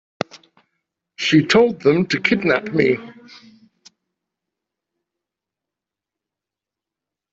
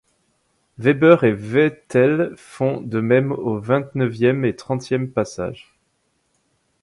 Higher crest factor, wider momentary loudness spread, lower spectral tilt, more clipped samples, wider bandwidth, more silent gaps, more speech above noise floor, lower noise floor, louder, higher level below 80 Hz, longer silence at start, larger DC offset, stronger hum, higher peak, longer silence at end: about the same, 20 dB vs 20 dB; first, 15 LU vs 12 LU; second, -5.5 dB/octave vs -7.5 dB/octave; neither; second, 8 kHz vs 11.5 kHz; neither; first, 70 dB vs 49 dB; first, -87 dBFS vs -68 dBFS; about the same, -17 LUFS vs -19 LUFS; about the same, -60 dBFS vs -56 dBFS; second, 0.35 s vs 0.8 s; neither; neither; about the same, -2 dBFS vs 0 dBFS; first, 4.2 s vs 1.3 s